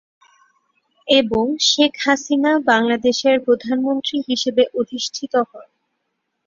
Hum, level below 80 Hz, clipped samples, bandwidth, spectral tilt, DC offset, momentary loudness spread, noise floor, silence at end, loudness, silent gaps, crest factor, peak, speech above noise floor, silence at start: none; -56 dBFS; under 0.1%; 7.6 kHz; -2.5 dB/octave; under 0.1%; 7 LU; -74 dBFS; 0.85 s; -18 LUFS; none; 18 dB; 0 dBFS; 56 dB; 1.05 s